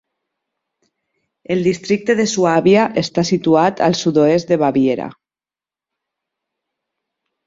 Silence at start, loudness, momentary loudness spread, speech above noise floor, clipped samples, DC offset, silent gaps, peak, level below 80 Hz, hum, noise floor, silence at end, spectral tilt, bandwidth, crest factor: 1.5 s; -15 LUFS; 6 LU; over 75 dB; under 0.1%; under 0.1%; none; -2 dBFS; -56 dBFS; none; under -90 dBFS; 2.35 s; -5.5 dB/octave; 7.8 kHz; 16 dB